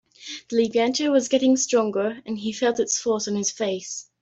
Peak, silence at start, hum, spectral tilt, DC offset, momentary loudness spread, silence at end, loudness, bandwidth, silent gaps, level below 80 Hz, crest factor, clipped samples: -8 dBFS; 0.2 s; none; -3 dB/octave; under 0.1%; 10 LU; 0.2 s; -23 LUFS; 8.2 kHz; none; -68 dBFS; 16 dB; under 0.1%